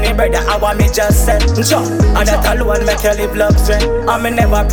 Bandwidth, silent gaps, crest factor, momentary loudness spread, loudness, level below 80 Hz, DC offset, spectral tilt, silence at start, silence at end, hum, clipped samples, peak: over 20 kHz; none; 12 dB; 3 LU; -13 LUFS; -16 dBFS; under 0.1%; -5 dB/octave; 0 s; 0 s; none; under 0.1%; 0 dBFS